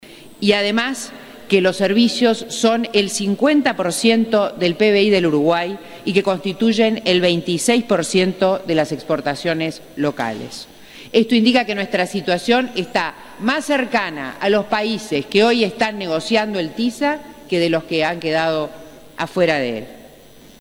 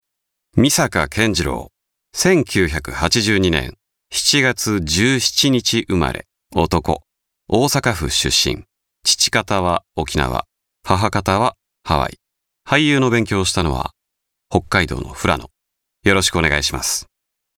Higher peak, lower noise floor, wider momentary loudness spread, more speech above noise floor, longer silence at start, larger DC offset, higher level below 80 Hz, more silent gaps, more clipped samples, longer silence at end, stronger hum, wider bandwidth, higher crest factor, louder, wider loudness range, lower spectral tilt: about the same, -2 dBFS vs -2 dBFS; second, -44 dBFS vs -77 dBFS; about the same, 10 LU vs 9 LU; second, 26 dB vs 60 dB; second, 0.05 s vs 0.55 s; first, 0.2% vs under 0.1%; second, -56 dBFS vs -36 dBFS; neither; neither; about the same, 0.55 s vs 0.55 s; neither; second, 16 kHz vs 19.5 kHz; about the same, 18 dB vs 18 dB; about the same, -18 LUFS vs -17 LUFS; about the same, 4 LU vs 3 LU; about the same, -4.5 dB/octave vs -3.5 dB/octave